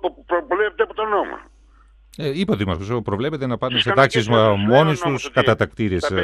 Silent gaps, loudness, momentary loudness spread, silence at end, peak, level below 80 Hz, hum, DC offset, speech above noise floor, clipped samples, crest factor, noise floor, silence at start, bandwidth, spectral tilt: none; -19 LUFS; 9 LU; 0 s; -2 dBFS; -48 dBFS; none; under 0.1%; 31 dB; under 0.1%; 18 dB; -50 dBFS; 0.05 s; 13 kHz; -6 dB/octave